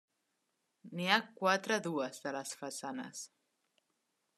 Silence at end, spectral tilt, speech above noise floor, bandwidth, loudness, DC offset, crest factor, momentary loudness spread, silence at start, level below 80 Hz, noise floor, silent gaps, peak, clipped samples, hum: 1.1 s; -3 dB/octave; 47 dB; 13.5 kHz; -35 LUFS; under 0.1%; 28 dB; 15 LU; 0.85 s; under -90 dBFS; -83 dBFS; none; -10 dBFS; under 0.1%; none